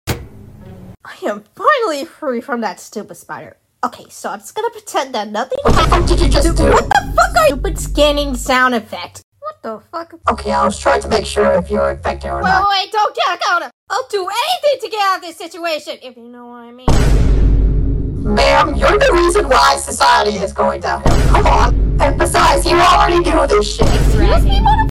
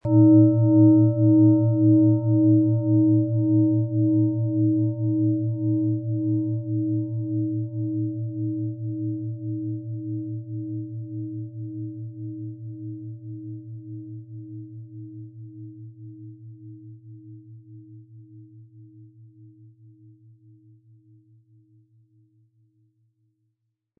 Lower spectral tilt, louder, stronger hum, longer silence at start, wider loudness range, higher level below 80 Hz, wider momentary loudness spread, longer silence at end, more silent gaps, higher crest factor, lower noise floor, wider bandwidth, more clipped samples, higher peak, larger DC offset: second, -4.5 dB/octave vs -17 dB/octave; first, -14 LUFS vs -22 LUFS; neither; about the same, 0.05 s vs 0.05 s; second, 8 LU vs 24 LU; first, -20 dBFS vs -68 dBFS; second, 16 LU vs 24 LU; second, 0 s vs 4.95 s; first, 9.24-9.32 s, 13.74-13.87 s vs none; about the same, 14 dB vs 18 dB; second, -35 dBFS vs -77 dBFS; first, 15.5 kHz vs 1.4 kHz; neither; first, 0 dBFS vs -6 dBFS; neither